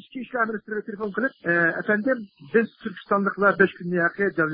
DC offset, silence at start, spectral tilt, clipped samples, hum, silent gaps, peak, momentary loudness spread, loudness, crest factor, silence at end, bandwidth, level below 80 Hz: under 0.1%; 0.15 s; -11 dB/octave; under 0.1%; none; none; -4 dBFS; 10 LU; -24 LUFS; 20 dB; 0 s; 5.2 kHz; -70 dBFS